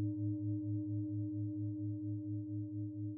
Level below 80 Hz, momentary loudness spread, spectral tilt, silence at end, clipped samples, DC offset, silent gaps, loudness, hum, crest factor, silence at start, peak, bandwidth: -78 dBFS; 4 LU; -11 dB/octave; 0 s; under 0.1%; under 0.1%; none; -41 LUFS; none; 10 dB; 0 s; -30 dBFS; 1 kHz